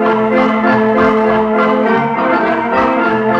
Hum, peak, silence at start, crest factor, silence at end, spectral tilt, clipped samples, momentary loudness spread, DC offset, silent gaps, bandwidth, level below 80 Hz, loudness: none; -2 dBFS; 0 s; 10 dB; 0 s; -7.5 dB/octave; under 0.1%; 2 LU; under 0.1%; none; 7.2 kHz; -44 dBFS; -12 LUFS